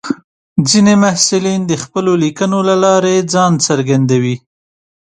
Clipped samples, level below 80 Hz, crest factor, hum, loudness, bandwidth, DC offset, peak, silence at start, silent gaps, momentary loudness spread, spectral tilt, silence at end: under 0.1%; -54 dBFS; 12 dB; none; -12 LUFS; 11.5 kHz; under 0.1%; 0 dBFS; 0.05 s; 0.24-0.56 s; 9 LU; -4.5 dB/octave; 0.75 s